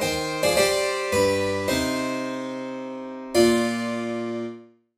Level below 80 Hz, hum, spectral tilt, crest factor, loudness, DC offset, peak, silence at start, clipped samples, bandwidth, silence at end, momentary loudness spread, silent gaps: -50 dBFS; none; -3.5 dB/octave; 18 dB; -24 LUFS; under 0.1%; -6 dBFS; 0 s; under 0.1%; 15.5 kHz; 0.3 s; 13 LU; none